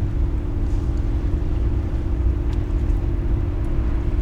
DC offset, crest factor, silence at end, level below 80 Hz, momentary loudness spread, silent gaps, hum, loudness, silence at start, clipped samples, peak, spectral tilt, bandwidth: under 0.1%; 12 dB; 0 s; -22 dBFS; 2 LU; none; none; -24 LUFS; 0 s; under 0.1%; -8 dBFS; -9 dB/octave; 6 kHz